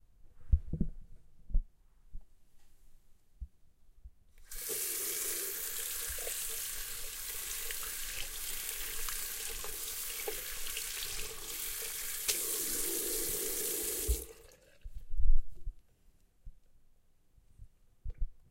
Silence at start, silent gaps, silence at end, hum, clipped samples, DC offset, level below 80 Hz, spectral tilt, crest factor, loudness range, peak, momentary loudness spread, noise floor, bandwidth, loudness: 0.25 s; none; 0.1 s; none; under 0.1%; under 0.1%; -40 dBFS; -2 dB/octave; 22 dB; 12 LU; -12 dBFS; 17 LU; -65 dBFS; 16 kHz; -36 LUFS